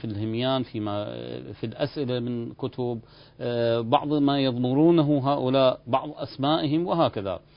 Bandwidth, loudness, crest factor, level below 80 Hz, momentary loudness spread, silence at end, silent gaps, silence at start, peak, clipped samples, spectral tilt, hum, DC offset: 5.4 kHz; -25 LUFS; 20 dB; -58 dBFS; 13 LU; 0.2 s; none; 0 s; -6 dBFS; under 0.1%; -11.5 dB/octave; none; under 0.1%